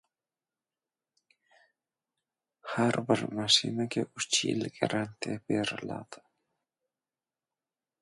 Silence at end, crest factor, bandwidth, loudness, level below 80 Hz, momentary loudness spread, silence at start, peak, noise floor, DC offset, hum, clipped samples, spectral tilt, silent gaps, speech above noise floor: 1.85 s; 24 dB; 11.5 kHz; -30 LUFS; -72 dBFS; 15 LU; 2.65 s; -10 dBFS; under -90 dBFS; under 0.1%; none; under 0.1%; -3.5 dB/octave; none; over 59 dB